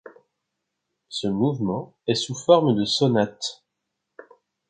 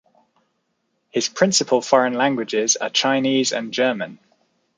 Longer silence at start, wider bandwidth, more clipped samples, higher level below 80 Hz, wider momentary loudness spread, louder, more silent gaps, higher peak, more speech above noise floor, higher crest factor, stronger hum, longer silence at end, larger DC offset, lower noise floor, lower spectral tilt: second, 0.05 s vs 1.15 s; about the same, 9.4 kHz vs 10 kHz; neither; first, -62 dBFS vs -72 dBFS; first, 12 LU vs 7 LU; second, -23 LUFS vs -19 LUFS; neither; about the same, -2 dBFS vs -2 dBFS; first, 59 dB vs 52 dB; about the same, 22 dB vs 20 dB; neither; first, 1.15 s vs 0.65 s; neither; first, -81 dBFS vs -71 dBFS; first, -5.5 dB/octave vs -2.5 dB/octave